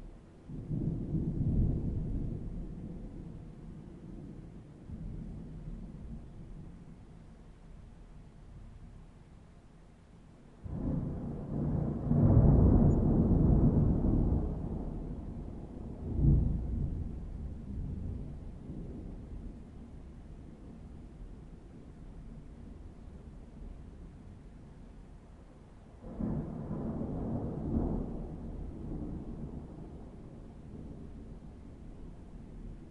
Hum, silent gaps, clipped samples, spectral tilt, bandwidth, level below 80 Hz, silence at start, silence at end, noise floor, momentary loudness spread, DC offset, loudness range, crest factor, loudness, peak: none; none; under 0.1%; -11.5 dB/octave; 4.1 kHz; -40 dBFS; 0 s; 0 s; -56 dBFS; 25 LU; under 0.1%; 23 LU; 22 dB; -34 LUFS; -12 dBFS